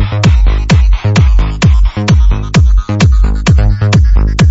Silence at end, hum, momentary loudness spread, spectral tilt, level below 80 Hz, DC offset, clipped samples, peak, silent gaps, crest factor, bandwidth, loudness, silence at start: 0 s; none; 2 LU; -6 dB/octave; -10 dBFS; under 0.1%; under 0.1%; 0 dBFS; none; 8 dB; 8 kHz; -10 LUFS; 0 s